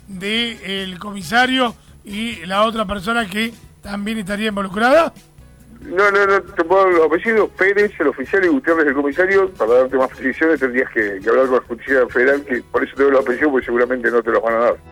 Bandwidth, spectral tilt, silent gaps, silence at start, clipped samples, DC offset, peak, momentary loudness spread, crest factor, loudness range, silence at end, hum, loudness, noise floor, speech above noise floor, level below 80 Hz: 18 kHz; -4.5 dB/octave; none; 0.1 s; under 0.1%; under 0.1%; -2 dBFS; 10 LU; 14 dB; 4 LU; 0 s; none; -17 LUFS; -43 dBFS; 26 dB; -48 dBFS